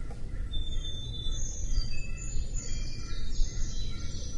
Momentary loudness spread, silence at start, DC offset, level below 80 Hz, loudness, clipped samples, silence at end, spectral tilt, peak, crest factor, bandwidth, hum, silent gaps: 4 LU; 0 s; under 0.1%; -32 dBFS; -38 LUFS; under 0.1%; 0 s; -3.5 dB/octave; -14 dBFS; 16 dB; 7.8 kHz; none; none